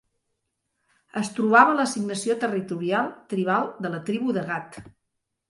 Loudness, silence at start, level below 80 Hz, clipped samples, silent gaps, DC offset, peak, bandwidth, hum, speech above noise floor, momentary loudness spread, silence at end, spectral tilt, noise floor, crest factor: -24 LUFS; 1.15 s; -68 dBFS; under 0.1%; none; under 0.1%; -4 dBFS; 11.5 kHz; none; 56 dB; 14 LU; 0.6 s; -5 dB/octave; -80 dBFS; 22 dB